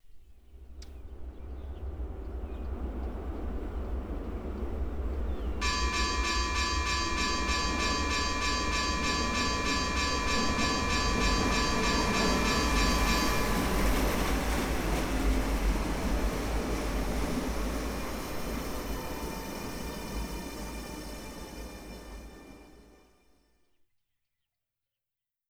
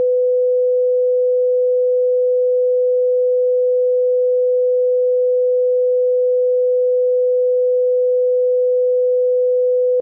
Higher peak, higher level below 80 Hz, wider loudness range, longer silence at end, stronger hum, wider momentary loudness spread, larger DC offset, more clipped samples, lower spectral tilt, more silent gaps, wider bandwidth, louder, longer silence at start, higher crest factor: about the same, -14 dBFS vs -12 dBFS; first, -36 dBFS vs under -90 dBFS; first, 14 LU vs 0 LU; first, 2.6 s vs 0 s; neither; first, 15 LU vs 0 LU; neither; neither; first, -4 dB/octave vs 5 dB/octave; neither; first, over 20 kHz vs 0.7 kHz; second, -31 LUFS vs -16 LUFS; about the same, 0.05 s vs 0 s; first, 16 dB vs 4 dB